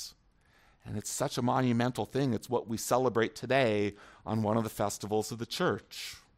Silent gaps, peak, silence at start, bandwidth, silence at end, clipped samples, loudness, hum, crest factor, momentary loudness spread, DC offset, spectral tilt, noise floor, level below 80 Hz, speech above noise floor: none; -12 dBFS; 0 s; 16 kHz; 0.2 s; under 0.1%; -31 LUFS; none; 20 dB; 10 LU; under 0.1%; -5 dB/octave; -66 dBFS; -64 dBFS; 34 dB